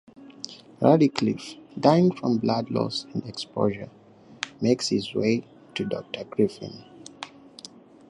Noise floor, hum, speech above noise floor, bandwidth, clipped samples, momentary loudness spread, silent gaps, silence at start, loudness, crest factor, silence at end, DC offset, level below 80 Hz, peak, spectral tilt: -48 dBFS; none; 24 dB; 11 kHz; under 0.1%; 21 LU; none; 0.2 s; -25 LUFS; 24 dB; 0.85 s; under 0.1%; -64 dBFS; -2 dBFS; -6 dB/octave